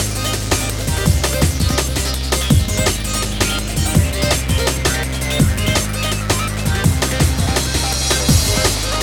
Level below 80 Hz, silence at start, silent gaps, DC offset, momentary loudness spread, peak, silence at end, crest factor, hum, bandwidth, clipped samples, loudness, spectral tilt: -22 dBFS; 0 s; none; under 0.1%; 4 LU; 0 dBFS; 0 s; 16 dB; none; 19.5 kHz; under 0.1%; -17 LUFS; -4 dB/octave